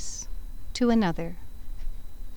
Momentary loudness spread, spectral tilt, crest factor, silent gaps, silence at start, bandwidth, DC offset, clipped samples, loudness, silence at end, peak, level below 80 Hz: 23 LU; -5 dB/octave; 18 dB; none; 0 s; 19.5 kHz; 2%; under 0.1%; -28 LUFS; 0 s; -12 dBFS; -36 dBFS